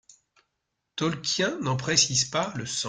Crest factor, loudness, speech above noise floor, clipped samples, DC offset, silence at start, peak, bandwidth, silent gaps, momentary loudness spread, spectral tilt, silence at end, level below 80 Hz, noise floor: 22 dB; -25 LUFS; 54 dB; under 0.1%; under 0.1%; 0.95 s; -6 dBFS; 10.5 kHz; none; 9 LU; -2.5 dB/octave; 0 s; -62 dBFS; -81 dBFS